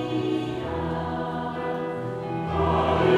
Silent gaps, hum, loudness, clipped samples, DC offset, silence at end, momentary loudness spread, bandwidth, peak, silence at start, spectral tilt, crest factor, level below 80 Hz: none; none; -27 LUFS; under 0.1%; under 0.1%; 0 s; 8 LU; 10.5 kHz; -10 dBFS; 0 s; -7.5 dB/octave; 16 dB; -42 dBFS